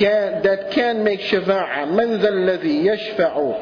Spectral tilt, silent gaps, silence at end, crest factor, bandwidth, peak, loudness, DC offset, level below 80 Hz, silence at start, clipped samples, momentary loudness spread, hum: -7 dB/octave; none; 0 s; 14 dB; 5.4 kHz; -4 dBFS; -19 LUFS; under 0.1%; -58 dBFS; 0 s; under 0.1%; 2 LU; none